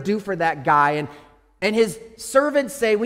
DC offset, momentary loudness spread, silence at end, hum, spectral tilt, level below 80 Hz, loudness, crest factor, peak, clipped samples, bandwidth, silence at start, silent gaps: under 0.1%; 9 LU; 0 s; none; -4.5 dB/octave; -58 dBFS; -20 LUFS; 16 dB; -4 dBFS; under 0.1%; 16 kHz; 0 s; none